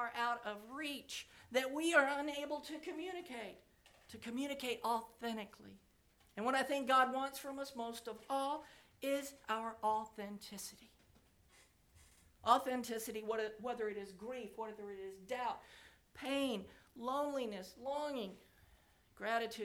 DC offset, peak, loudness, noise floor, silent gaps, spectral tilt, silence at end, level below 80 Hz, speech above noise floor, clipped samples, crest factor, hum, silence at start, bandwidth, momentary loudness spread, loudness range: under 0.1%; -16 dBFS; -40 LUFS; -71 dBFS; none; -3 dB/octave; 0 s; -74 dBFS; 31 dB; under 0.1%; 26 dB; none; 0 s; 20 kHz; 16 LU; 6 LU